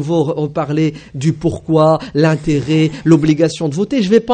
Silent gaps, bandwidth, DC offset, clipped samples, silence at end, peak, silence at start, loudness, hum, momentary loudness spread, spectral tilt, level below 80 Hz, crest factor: none; 9.4 kHz; under 0.1%; under 0.1%; 0 s; 0 dBFS; 0 s; -15 LUFS; none; 7 LU; -7 dB/octave; -42 dBFS; 14 dB